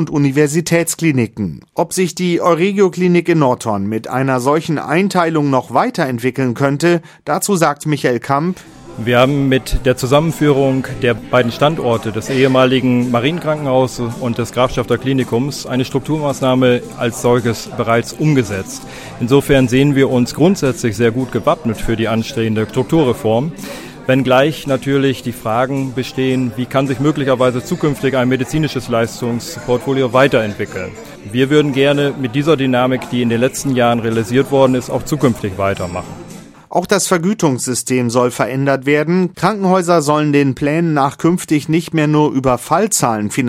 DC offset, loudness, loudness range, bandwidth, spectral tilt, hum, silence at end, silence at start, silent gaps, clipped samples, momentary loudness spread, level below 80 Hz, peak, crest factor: under 0.1%; -15 LUFS; 2 LU; 16.5 kHz; -5.5 dB/octave; none; 0 s; 0 s; none; under 0.1%; 8 LU; -38 dBFS; 0 dBFS; 14 dB